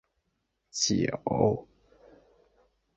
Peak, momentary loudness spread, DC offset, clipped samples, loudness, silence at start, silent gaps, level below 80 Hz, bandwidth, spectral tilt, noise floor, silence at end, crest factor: -10 dBFS; 9 LU; under 0.1%; under 0.1%; -28 LUFS; 0.75 s; none; -58 dBFS; 8.4 kHz; -4.5 dB/octave; -79 dBFS; 1.35 s; 24 dB